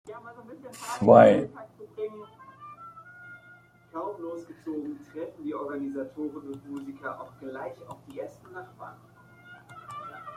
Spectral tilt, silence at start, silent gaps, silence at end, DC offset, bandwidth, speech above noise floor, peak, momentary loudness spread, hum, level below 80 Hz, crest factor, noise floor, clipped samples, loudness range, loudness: -7 dB/octave; 0.05 s; none; 0 s; under 0.1%; 14.5 kHz; 29 dB; -4 dBFS; 23 LU; none; -70 dBFS; 26 dB; -55 dBFS; under 0.1%; 17 LU; -26 LUFS